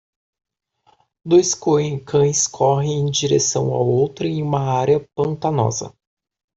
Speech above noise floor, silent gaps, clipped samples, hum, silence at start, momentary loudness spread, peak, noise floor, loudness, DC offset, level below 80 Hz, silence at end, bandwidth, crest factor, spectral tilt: 41 dB; none; under 0.1%; none; 1.25 s; 6 LU; -4 dBFS; -59 dBFS; -18 LUFS; under 0.1%; -56 dBFS; 0.65 s; 8.2 kHz; 16 dB; -5 dB/octave